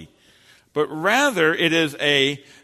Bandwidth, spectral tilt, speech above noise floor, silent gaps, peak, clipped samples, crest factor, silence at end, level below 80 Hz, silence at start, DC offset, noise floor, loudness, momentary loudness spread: 13.5 kHz; -3.5 dB/octave; 34 dB; none; -4 dBFS; under 0.1%; 18 dB; 0.25 s; -64 dBFS; 0 s; under 0.1%; -54 dBFS; -19 LUFS; 8 LU